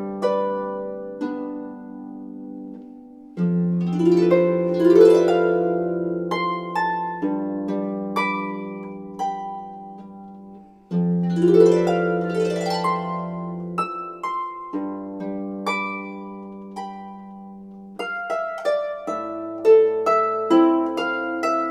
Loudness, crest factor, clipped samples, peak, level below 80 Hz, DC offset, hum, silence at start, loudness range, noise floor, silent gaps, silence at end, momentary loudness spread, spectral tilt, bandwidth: -21 LUFS; 20 dB; under 0.1%; -2 dBFS; -64 dBFS; under 0.1%; none; 0 s; 11 LU; -44 dBFS; none; 0 s; 21 LU; -7.5 dB/octave; 11.5 kHz